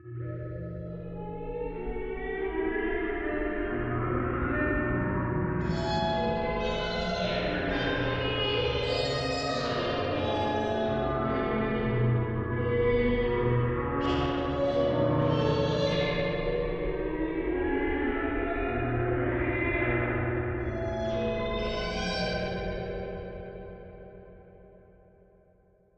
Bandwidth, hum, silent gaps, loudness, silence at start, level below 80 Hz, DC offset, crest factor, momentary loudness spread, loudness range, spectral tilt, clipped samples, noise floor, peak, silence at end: 8.6 kHz; none; none; -29 LUFS; 0.05 s; -40 dBFS; under 0.1%; 16 dB; 10 LU; 6 LU; -7 dB/octave; under 0.1%; -63 dBFS; -14 dBFS; 1.2 s